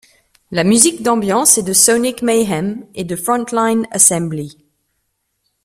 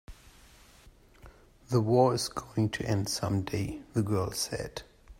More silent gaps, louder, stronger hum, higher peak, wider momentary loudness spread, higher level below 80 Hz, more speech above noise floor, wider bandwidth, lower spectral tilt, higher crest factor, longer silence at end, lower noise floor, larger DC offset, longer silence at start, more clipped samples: neither; first, -13 LUFS vs -30 LUFS; neither; first, 0 dBFS vs -10 dBFS; first, 13 LU vs 10 LU; about the same, -54 dBFS vs -54 dBFS; first, 54 dB vs 28 dB; first, over 20 kHz vs 16 kHz; second, -3 dB/octave vs -5.5 dB/octave; second, 16 dB vs 22 dB; first, 1.1 s vs 0.05 s; first, -69 dBFS vs -57 dBFS; neither; first, 0.5 s vs 0.1 s; neither